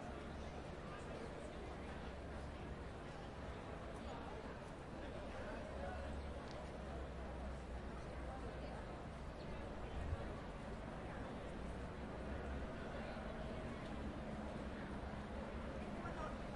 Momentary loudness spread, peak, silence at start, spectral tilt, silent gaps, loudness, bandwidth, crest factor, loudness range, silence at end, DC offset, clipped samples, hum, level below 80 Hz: 3 LU; -30 dBFS; 0 s; -6.5 dB/octave; none; -50 LUFS; 11 kHz; 18 dB; 2 LU; 0 s; under 0.1%; under 0.1%; none; -54 dBFS